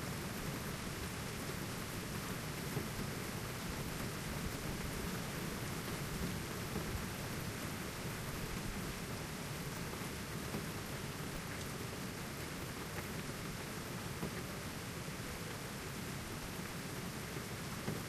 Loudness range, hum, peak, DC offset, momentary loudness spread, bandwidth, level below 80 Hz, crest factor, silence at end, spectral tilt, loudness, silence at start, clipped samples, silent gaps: 2 LU; none; -26 dBFS; under 0.1%; 3 LU; 15.5 kHz; -54 dBFS; 16 dB; 0 s; -4 dB/octave; -43 LUFS; 0 s; under 0.1%; none